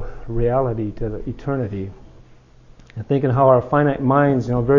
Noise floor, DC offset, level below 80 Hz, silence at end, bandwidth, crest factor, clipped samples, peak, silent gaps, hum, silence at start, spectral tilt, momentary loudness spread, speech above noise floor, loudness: -47 dBFS; under 0.1%; -38 dBFS; 0 s; 7.2 kHz; 18 dB; under 0.1%; -2 dBFS; none; none; 0 s; -10 dB/octave; 15 LU; 29 dB; -19 LUFS